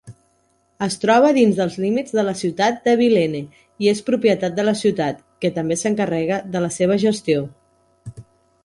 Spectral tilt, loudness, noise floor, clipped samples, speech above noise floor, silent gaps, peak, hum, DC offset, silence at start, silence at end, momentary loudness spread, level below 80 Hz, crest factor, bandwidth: -5.5 dB/octave; -19 LUFS; -63 dBFS; under 0.1%; 44 dB; none; -4 dBFS; none; under 0.1%; 0.05 s; 0.4 s; 10 LU; -58 dBFS; 16 dB; 11.5 kHz